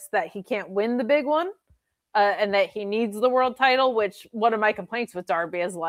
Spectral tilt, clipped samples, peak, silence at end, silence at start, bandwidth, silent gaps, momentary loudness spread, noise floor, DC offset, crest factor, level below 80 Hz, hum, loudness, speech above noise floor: -4.5 dB/octave; under 0.1%; -6 dBFS; 0 s; 0 s; 16 kHz; none; 9 LU; -66 dBFS; under 0.1%; 18 dB; -72 dBFS; none; -24 LUFS; 42 dB